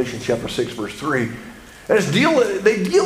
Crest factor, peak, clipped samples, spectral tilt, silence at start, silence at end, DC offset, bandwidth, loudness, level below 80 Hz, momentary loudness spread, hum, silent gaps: 18 dB; -2 dBFS; under 0.1%; -5 dB/octave; 0 s; 0 s; under 0.1%; 15.5 kHz; -19 LUFS; -50 dBFS; 15 LU; none; none